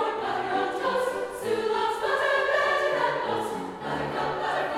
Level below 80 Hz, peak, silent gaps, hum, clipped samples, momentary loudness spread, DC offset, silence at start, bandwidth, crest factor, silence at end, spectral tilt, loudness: -60 dBFS; -12 dBFS; none; none; under 0.1%; 7 LU; under 0.1%; 0 s; 16 kHz; 14 dB; 0 s; -4 dB/octave; -27 LUFS